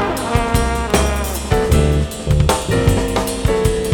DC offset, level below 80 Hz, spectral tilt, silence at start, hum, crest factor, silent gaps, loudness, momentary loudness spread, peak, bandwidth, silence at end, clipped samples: under 0.1%; -22 dBFS; -5.5 dB/octave; 0 s; none; 14 dB; none; -17 LUFS; 4 LU; -2 dBFS; 19.5 kHz; 0 s; under 0.1%